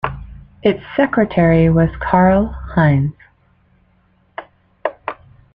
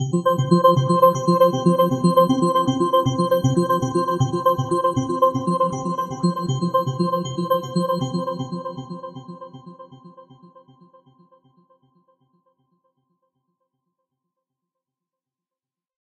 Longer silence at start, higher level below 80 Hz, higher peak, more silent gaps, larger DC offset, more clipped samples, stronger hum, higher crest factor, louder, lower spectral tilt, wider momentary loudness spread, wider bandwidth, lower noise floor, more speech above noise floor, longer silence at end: about the same, 0.05 s vs 0 s; first, -34 dBFS vs -58 dBFS; about the same, -2 dBFS vs -2 dBFS; neither; neither; neither; neither; about the same, 16 dB vs 20 dB; first, -16 LUFS vs -20 LUFS; first, -11 dB/octave vs -7 dB/octave; first, 22 LU vs 14 LU; second, 4.4 kHz vs 13.5 kHz; second, -57 dBFS vs under -90 dBFS; second, 43 dB vs over 74 dB; second, 0.4 s vs 5.9 s